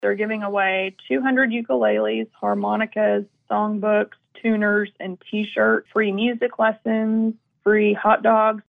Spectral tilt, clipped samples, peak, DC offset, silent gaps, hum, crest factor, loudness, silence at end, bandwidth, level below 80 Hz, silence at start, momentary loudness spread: -8.5 dB/octave; under 0.1%; -6 dBFS; under 0.1%; none; none; 16 dB; -21 LUFS; 0.1 s; 3.8 kHz; -70 dBFS; 0 s; 8 LU